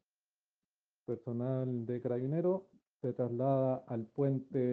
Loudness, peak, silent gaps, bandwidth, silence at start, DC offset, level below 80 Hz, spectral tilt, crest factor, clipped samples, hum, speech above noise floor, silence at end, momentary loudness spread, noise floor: -36 LUFS; -20 dBFS; none; 4.1 kHz; 1.1 s; under 0.1%; -80 dBFS; -12 dB/octave; 16 dB; under 0.1%; none; over 56 dB; 0 s; 9 LU; under -90 dBFS